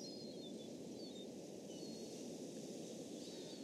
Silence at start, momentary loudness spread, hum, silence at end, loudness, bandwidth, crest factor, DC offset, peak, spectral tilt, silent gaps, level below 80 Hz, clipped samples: 0 s; 2 LU; none; 0 s; -51 LUFS; 15.5 kHz; 14 dB; under 0.1%; -38 dBFS; -4.5 dB/octave; none; -88 dBFS; under 0.1%